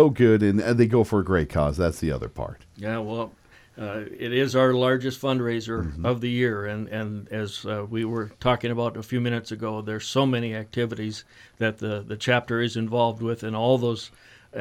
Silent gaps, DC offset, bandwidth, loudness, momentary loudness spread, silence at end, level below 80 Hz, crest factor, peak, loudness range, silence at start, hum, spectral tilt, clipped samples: none; under 0.1%; 15 kHz; -25 LUFS; 13 LU; 0 s; -46 dBFS; 20 dB; -4 dBFS; 3 LU; 0 s; none; -6.5 dB/octave; under 0.1%